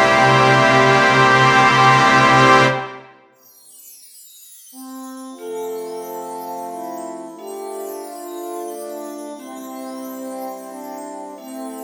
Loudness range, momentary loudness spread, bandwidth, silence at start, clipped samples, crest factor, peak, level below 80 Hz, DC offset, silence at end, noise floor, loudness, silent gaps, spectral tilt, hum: 19 LU; 22 LU; 19 kHz; 0 s; under 0.1%; 18 dB; 0 dBFS; -52 dBFS; under 0.1%; 0 s; -49 dBFS; -12 LUFS; none; -4.5 dB/octave; none